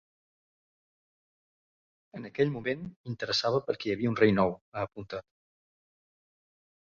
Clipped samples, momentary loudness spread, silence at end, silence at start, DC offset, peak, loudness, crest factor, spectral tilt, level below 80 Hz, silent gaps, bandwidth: under 0.1%; 16 LU; 1.65 s; 2.15 s; under 0.1%; -10 dBFS; -29 LUFS; 24 dB; -6 dB/octave; -64 dBFS; 2.96-3.04 s, 4.61-4.72 s; 7.4 kHz